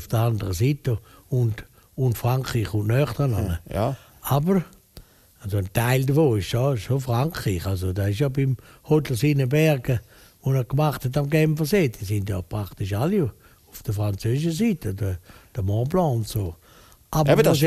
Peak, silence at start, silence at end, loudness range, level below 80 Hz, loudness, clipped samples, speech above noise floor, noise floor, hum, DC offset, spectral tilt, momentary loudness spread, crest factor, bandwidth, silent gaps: -4 dBFS; 0 s; 0 s; 3 LU; -44 dBFS; -24 LUFS; under 0.1%; 29 dB; -52 dBFS; none; under 0.1%; -6.5 dB/octave; 10 LU; 20 dB; 15 kHz; none